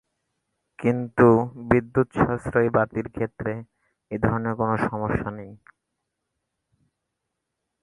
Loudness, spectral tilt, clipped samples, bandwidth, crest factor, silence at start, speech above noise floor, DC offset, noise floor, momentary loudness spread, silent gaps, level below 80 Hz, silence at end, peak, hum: -23 LUFS; -9.5 dB/octave; under 0.1%; 11 kHz; 22 dB; 0.8 s; 58 dB; under 0.1%; -81 dBFS; 13 LU; none; -48 dBFS; 2.25 s; -2 dBFS; none